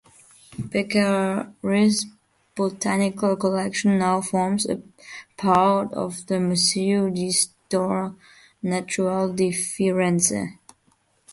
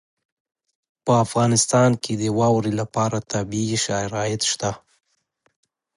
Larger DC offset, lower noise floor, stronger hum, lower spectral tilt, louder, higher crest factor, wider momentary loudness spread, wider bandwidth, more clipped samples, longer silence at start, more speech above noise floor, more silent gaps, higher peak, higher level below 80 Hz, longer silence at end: neither; second, -64 dBFS vs -68 dBFS; neither; about the same, -4.5 dB/octave vs -4.5 dB/octave; about the same, -22 LUFS vs -21 LUFS; about the same, 18 dB vs 18 dB; first, 12 LU vs 9 LU; about the same, 12 kHz vs 11.5 kHz; neither; second, 0.5 s vs 1.05 s; second, 42 dB vs 47 dB; neither; about the same, -4 dBFS vs -4 dBFS; second, -62 dBFS vs -54 dBFS; second, 0.8 s vs 1.2 s